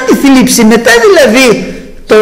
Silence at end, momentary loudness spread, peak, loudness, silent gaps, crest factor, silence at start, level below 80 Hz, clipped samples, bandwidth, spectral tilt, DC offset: 0 s; 7 LU; 0 dBFS; -4 LUFS; none; 6 dB; 0 s; -32 dBFS; 1%; 16.5 kHz; -3.5 dB/octave; under 0.1%